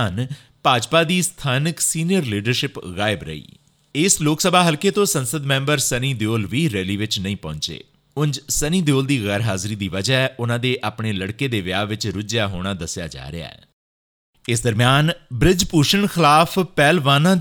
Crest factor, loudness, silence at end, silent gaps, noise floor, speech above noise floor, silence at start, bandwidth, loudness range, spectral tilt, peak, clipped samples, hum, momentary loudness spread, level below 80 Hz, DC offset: 18 dB; -19 LUFS; 0 s; 13.73-14.33 s; under -90 dBFS; over 71 dB; 0 s; over 20 kHz; 6 LU; -4 dB/octave; 0 dBFS; under 0.1%; none; 12 LU; -42 dBFS; under 0.1%